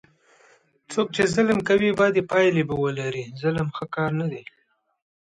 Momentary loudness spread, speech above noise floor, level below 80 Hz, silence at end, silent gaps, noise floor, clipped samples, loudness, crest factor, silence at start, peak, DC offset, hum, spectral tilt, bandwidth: 10 LU; 36 dB; -56 dBFS; 0.8 s; none; -58 dBFS; under 0.1%; -23 LUFS; 18 dB; 0.9 s; -6 dBFS; under 0.1%; none; -6 dB/octave; 11 kHz